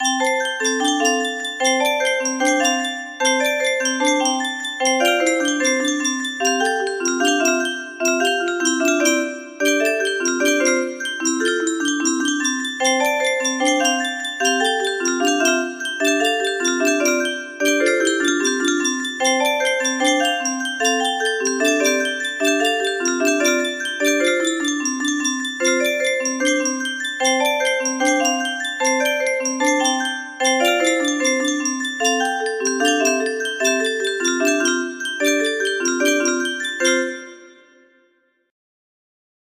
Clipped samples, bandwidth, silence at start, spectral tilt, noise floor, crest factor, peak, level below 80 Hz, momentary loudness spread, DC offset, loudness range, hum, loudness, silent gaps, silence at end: under 0.1%; 15.5 kHz; 0 s; 0 dB/octave; -62 dBFS; 18 dB; -2 dBFS; -70 dBFS; 4 LU; under 0.1%; 1 LU; none; -18 LUFS; none; 1.95 s